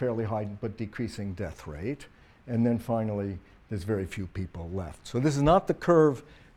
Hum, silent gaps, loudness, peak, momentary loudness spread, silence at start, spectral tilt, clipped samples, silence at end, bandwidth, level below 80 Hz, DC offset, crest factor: none; none; -29 LUFS; -10 dBFS; 15 LU; 0 s; -7.5 dB/octave; under 0.1%; 0.2 s; 14.5 kHz; -48 dBFS; under 0.1%; 20 dB